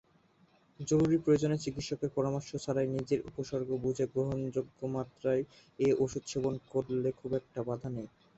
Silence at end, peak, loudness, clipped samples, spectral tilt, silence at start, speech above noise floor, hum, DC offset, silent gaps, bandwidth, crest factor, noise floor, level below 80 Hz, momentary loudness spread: 0.3 s; -16 dBFS; -33 LUFS; under 0.1%; -6.5 dB/octave; 0.8 s; 34 dB; none; under 0.1%; none; 8.2 kHz; 18 dB; -67 dBFS; -62 dBFS; 9 LU